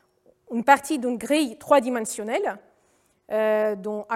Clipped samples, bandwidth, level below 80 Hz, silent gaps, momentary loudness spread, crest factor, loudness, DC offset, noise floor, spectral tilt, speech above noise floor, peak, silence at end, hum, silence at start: under 0.1%; 16 kHz; -70 dBFS; none; 11 LU; 22 dB; -23 LUFS; under 0.1%; -65 dBFS; -3.5 dB/octave; 42 dB; -2 dBFS; 0 s; none; 0.5 s